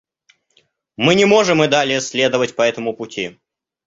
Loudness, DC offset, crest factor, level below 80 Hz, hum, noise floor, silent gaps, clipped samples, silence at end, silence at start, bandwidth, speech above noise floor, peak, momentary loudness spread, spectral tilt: -16 LUFS; under 0.1%; 16 dB; -56 dBFS; none; -61 dBFS; none; under 0.1%; 0.55 s; 1 s; 8 kHz; 45 dB; 0 dBFS; 13 LU; -4 dB/octave